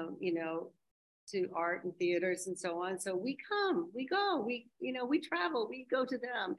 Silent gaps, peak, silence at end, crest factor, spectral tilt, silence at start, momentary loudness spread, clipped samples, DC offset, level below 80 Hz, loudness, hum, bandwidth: 0.91-1.27 s; -20 dBFS; 0 s; 16 dB; -4 dB/octave; 0 s; 7 LU; under 0.1%; under 0.1%; -86 dBFS; -36 LUFS; none; 12.5 kHz